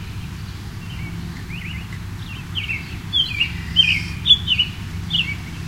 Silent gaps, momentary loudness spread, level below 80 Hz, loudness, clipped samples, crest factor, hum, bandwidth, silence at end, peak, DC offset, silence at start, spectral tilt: none; 17 LU; -36 dBFS; -19 LUFS; under 0.1%; 20 dB; none; 16 kHz; 0 s; -2 dBFS; under 0.1%; 0 s; -3.5 dB/octave